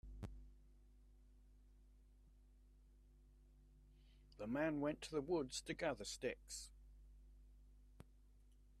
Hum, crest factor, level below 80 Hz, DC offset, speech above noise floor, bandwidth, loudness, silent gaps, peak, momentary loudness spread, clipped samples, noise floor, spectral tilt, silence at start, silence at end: 50 Hz at -65 dBFS; 22 dB; -64 dBFS; under 0.1%; 23 dB; 13.5 kHz; -45 LUFS; none; -28 dBFS; 25 LU; under 0.1%; -68 dBFS; -4.5 dB/octave; 0.05 s; 0 s